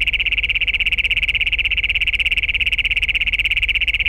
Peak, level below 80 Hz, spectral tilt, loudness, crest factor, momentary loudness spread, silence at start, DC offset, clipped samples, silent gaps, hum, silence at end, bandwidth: -6 dBFS; -30 dBFS; -1.5 dB/octave; -16 LUFS; 12 dB; 1 LU; 0 s; under 0.1%; under 0.1%; none; none; 0 s; 16 kHz